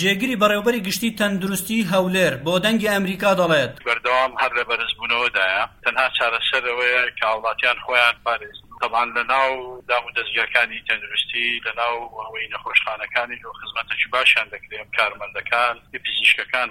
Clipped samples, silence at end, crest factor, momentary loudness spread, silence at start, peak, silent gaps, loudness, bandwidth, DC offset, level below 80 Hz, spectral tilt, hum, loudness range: under 0.1%; 0 s; 20 dB; 10 LU; 0 s; -2 dBFS; none; -20 LUFS; 16.5 kHz; under 0.1%; -54 dBFS; -3.5 dB/octave; none; 2 LU